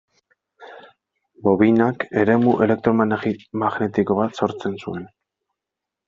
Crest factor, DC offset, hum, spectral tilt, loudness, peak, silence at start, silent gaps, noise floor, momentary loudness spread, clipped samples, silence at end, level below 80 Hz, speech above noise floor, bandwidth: 18 dB; under 0.1%; none; -6.5 dB/octave; -20 LUFS; -2 dBFS; 0.6 s; none; -85 dBFS; 11 LU; under 0.1%; 1 s; -60 dBFS; 66 dB; 7.4 kHz